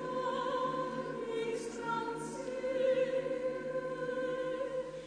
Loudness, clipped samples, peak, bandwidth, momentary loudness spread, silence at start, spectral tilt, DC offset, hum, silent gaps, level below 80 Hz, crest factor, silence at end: -36 LUFS; under 0.1%; -22 dBFS; 10 kHz; 7 LU; 0 s; -5 dB/octave; under 0.1%; none; none; -68 dBFS; 14 dB; 0 s